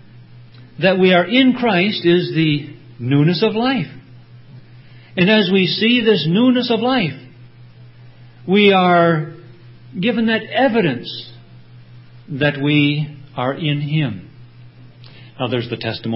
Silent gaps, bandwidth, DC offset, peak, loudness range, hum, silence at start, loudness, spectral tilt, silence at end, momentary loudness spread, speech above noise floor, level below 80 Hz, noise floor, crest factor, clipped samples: none; 5.8 kHz; under 0.1%; 0 dBFS; 5 LU; none; 0.15 s; -16 LUFS; -11 dB/octave; 0 s; 16 LU; 26 dB; -58 dBFS; -41 dBFS; 18 dB; under 0.1%